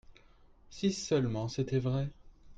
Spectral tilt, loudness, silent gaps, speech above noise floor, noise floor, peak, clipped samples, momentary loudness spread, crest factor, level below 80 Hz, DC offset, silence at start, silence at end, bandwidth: -6 dB/octave; -33 LUFS; none; 28 dB; -60 dBFS; -18 dBFS; under 0.1%; 7 LU; 18 dB; -56 dBFS; under 0.1%; 0.1 s; 0 s; 9 kHz